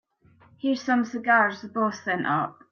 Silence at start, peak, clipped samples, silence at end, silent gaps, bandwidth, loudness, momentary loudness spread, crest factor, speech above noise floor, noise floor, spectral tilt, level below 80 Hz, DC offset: 0.65 s; -8 dBFS; under 0.1%; 0.2 s; none; 7 kHz; -25 LUFS; 7 LU; 18 dB; 33 dB; -58 dBFS; -5.5 dB/octave; -74 dBFS; under 0.1%